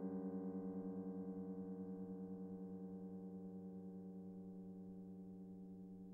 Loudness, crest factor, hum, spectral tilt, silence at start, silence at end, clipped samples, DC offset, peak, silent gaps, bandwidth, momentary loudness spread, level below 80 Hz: -51 LUFS; 14 dB; none; -11.5 dB/octave; 0 s; 0 s; under 0.1%; under 0.1%; -36 dBFS; none; 2 kHz; 8 LU; -80 dBFS